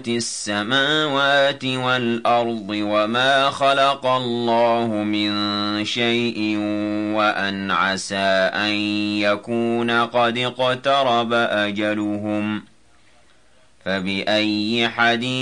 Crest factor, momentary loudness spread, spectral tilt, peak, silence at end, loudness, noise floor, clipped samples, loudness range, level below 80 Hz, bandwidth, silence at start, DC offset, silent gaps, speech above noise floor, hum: 16 dB; 6 LU; -4 dB/octave; -6 dBFS; 0 s; -20 LUFS; -57 dBFS; under 0.1%; 4 LU; -64 dBFS; 11 kHz; 0 s; 0.2%; none; 37 dB; none